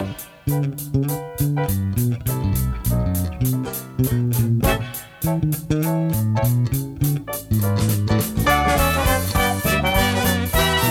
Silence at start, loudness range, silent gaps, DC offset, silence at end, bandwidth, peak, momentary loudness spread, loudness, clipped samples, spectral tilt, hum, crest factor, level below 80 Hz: 0 s; 4 LU; none; under 0.1%; 0 s; 17.5 kHz; -4 dBFS; 6 LU; -21 LUFS; under 0.1%; -5 dB/octave; none; 16 dB; -32 dBFS